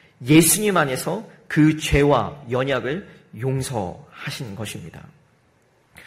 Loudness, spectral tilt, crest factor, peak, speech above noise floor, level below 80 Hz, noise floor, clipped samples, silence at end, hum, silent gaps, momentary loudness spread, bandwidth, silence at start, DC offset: -20 LUFS; -4.5 dB/octave; 20 dB; -2 dBFS; 39 dB; -40 dBFS; -60 dBFS; under 0.1%; 0.05 s; none; none; 17 LU; 16 kHz; 0.2 s; under 0.1%